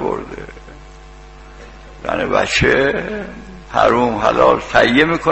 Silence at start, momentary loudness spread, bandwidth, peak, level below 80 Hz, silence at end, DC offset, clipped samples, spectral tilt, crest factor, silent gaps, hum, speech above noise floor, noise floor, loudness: 0 s; 19 LU; 8.4 kHz; 0 dBFS; -36 dBFS; 0 s; 0.2%; under 0.1%; -5 dB/octave; 16 dB; none; none; 23 dB; -38 dBFS; -15 LUFS